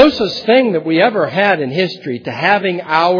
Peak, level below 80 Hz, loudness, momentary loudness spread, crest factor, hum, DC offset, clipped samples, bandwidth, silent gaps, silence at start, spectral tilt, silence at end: 0 dBFS; -52 dBFS; -14 LUFS; 6 LU; 14 dB; none; under 0.1%; 0.2%; 5.4 kHz; none; 0 s; -6.5 dB/octave; 0 s